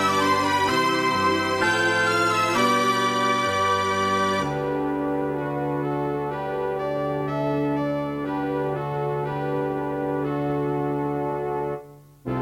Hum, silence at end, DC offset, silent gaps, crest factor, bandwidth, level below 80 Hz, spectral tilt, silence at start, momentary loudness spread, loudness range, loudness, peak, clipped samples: none; 0 s; under 0.1%; none; 16 dB; 16.5 kHz; -54 dBFS; -5 dB/octave; 0 s; 7 LU; 6 LU; -23 LUFS; -8 dBFS; under 0.1%